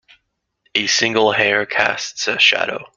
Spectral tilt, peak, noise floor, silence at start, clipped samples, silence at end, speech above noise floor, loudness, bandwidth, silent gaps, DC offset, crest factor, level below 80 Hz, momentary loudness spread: -1.5 dB/octave; 0 dBFS; -69 dBFS; 0.75 s; under 0.1%; 0.1 s; 52 dB; -16 LUFS; 9.2 kHz; none; under 0.1%; 18 dB; -60 dBFS; 8 LU